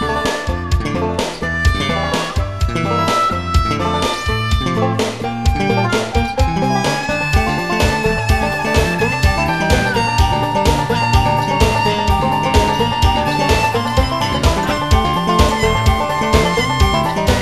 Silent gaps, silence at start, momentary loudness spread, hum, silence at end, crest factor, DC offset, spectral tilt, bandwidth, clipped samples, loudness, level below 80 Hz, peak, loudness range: none; 0 s; 5 LU; none; 0 s; 14 dB; 0.9%; -5 dB/octave; 14.5 kHz; under 0.1%; -16 LUFS; -22 dBFS; 0 dBFS; 2 LU